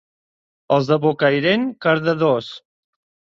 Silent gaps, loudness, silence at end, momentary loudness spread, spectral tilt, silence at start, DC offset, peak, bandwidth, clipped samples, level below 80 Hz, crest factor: none; -18 LUFS; 0.65 s; 4 LU; -7 dB/octave; 0.7 s; under 0.1%; -2 dBFS; 7.4 kHz; under 0.1%; -64 dBFS; 18 dB